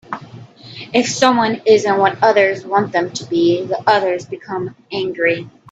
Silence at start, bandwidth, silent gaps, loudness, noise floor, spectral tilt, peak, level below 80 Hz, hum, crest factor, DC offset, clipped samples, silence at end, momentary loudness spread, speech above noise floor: 0.1 s; 8.8 kHz; none; -16 LUFS; -37 dBFS; -4 dB/octave; 0 dBFS; -60 dBFS; none; 16 dB; under 0.1%; under 0.1%; 0.2 s; 12 LU; 22 dB